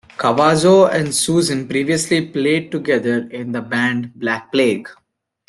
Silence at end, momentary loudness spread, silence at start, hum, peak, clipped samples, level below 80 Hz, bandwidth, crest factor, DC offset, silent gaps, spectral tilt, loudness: 0.55 s; 10 LU; 0.2 s; none; -2 dBFS; under 0.1%; -56 dBFS; 12.5 kHz; 16 dB; under 0.1%; none; -4.5 dB/octave; -17 LUFS